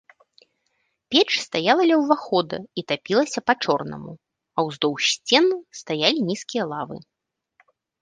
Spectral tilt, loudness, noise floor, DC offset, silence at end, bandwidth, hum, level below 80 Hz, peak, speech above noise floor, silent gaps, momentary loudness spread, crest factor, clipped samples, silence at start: -3.5 dB/octave; -22 LUFS; -72 dBFS; under 0.1%; 1.05 s; 10 kHz; none; -68 dBFS; -2 dBFS; 50 dB; none; 13 LU; 22 dB; under 0.1%; 1.1 s